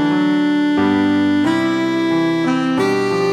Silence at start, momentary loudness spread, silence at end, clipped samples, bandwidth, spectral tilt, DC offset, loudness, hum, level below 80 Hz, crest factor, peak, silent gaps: 0 s; 2 LU; 0 s; under 0.1%; 11 kHz; -6 dB/octave; under 0.1%; -16 LUFS; none; -56 dBFS; 10 dB; -6 dBFS; none